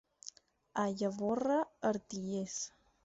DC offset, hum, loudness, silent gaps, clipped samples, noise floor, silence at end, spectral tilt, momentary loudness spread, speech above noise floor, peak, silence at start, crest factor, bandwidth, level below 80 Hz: under 0.1%; none; -37 LUFS; none; under 0.1%; -56 dBFS; 0.35 s; -5.5 dB/octave; 15 LU; 21 dB; -20 dBFS; 0.25 s; 18 dB; 8 kHz; -74 dBFS